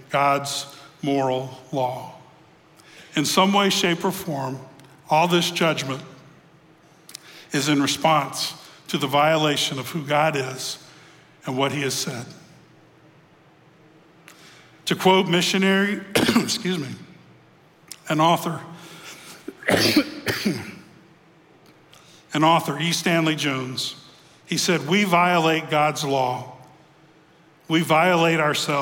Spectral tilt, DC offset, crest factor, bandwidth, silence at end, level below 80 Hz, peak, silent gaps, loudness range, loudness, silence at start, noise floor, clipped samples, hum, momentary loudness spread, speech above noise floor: -4 dB/octave; under 0.1%; 20 dB; 17 kHz; 0 s; -64 dBFS; -4 dBFS; none; 5 LU; -21 LUFS; 0 s; -54 dBFS; under 0.1%; none; 19 LU; 33 dB